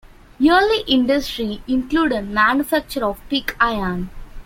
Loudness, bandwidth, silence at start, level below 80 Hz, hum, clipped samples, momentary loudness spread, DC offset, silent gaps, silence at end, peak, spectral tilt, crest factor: -19 LUFS; 16.5 kHz; 0.4 s; -38 dBFS; none; under 0.1%; 9 LU; under 0.1%; none; 0.05 s; -2 dBFS; -4.5 dB/octave; 18 dB